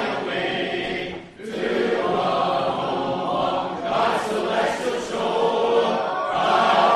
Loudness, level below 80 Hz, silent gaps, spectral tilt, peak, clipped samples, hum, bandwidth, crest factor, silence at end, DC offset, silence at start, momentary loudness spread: -22 LUFS; -56 dBFS; none; -4.5 dB/octave; -6 dBFS; under 0.1%; none; 13 kHz; 16 dB; 0 s; under 0.1%; 0 s; 6 LU